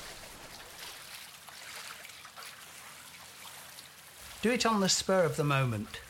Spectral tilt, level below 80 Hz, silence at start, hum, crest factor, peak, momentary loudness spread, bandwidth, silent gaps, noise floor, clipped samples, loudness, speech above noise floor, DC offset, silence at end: -4 dB/octave; -62 dBFS; 0 s; none; 20 dB; -14 dBFS; 20 LU; 17.5 kHz; none; -51 dBFS; under 0.1%; -30 LUFS; 22 dB; under 0.1%; 0 s